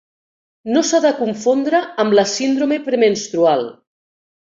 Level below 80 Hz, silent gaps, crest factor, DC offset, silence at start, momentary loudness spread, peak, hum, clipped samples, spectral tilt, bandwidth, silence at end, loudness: -64 dBFS; none; 16 dB; under 0.1%; 0.65 s; 5 LU; -2 dBFS; none; under 0.1%; -4 dB/octave; 7.8 kHz; 0.7 s; -16 LUFS